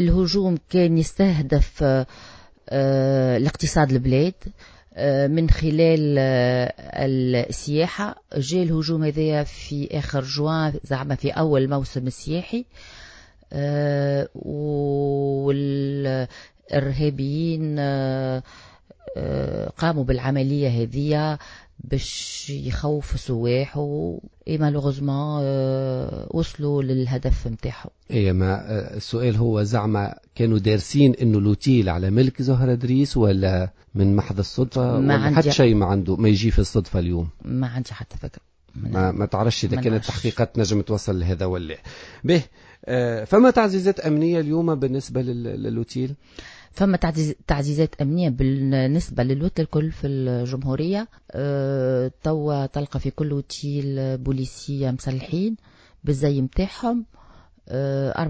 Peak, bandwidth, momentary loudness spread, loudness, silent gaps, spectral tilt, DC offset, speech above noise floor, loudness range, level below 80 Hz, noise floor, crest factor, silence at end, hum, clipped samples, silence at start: -2 dBFS; 8 kHz; 10 LU; -22 LUFS; none; -7 dB/octave; under 0.1%; 28 dB; 6 LU; -36 dBFS; -49 dBFS; 20 dB; 0 s; none; under 0.1%; 0 s